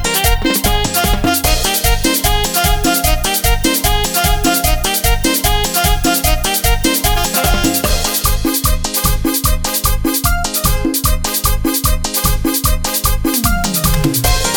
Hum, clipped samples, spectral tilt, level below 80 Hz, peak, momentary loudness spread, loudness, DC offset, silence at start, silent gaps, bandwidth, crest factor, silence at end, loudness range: none; under 0.1%; -3 dB/octave; -18 dBFS; 0 dBFS; 2 LU; -14 LUFS; under 0.1%; 0 s; none; over 20 kHz; 14 dB; 0 s; 2 LU